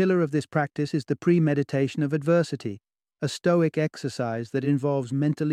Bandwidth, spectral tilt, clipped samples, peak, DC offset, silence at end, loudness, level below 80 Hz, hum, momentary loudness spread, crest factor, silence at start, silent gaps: 12 kHz; -7.5 dB/octave; under 0.1%; -10 dBFS; under 0.1%; 0 s; -25 LUFS; -68 dBFS; none; 8 LU; 16 dB; 0 s; none